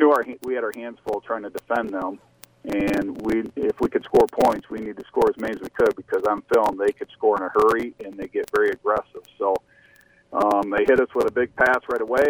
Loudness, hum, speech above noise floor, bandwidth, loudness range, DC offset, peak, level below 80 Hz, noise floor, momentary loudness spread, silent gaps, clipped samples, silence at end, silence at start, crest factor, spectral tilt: -23 LUFS; none; 33 dB; over 20 kHz; 4 LU; under 0.1%; -4 dBFS; -52 dBFS; -55 dBFS; 11 LU; none; under 0.1%; 0 s; 0 s; 18 dB; -6 dB/octave